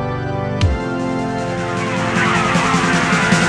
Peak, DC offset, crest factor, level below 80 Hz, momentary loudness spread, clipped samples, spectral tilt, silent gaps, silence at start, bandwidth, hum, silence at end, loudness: -2 dBFS; under 0.1%; 14 dB; -32 dBFS; 7 LU; under 0.1%; -5 dB/octave; none; 0 s; 10.5 kHz; none; 0 s; -17 LUFS